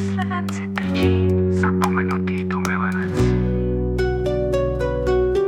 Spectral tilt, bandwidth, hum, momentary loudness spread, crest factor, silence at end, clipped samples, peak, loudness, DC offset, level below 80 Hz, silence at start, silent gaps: -7.5 dB/octave; 14 kHz; none; 4 LU; 18 dB; 0 s; under 0.1%; -2 dBFS; -21 LUFS; under 0.1%; -30 dBFS; 0 s; none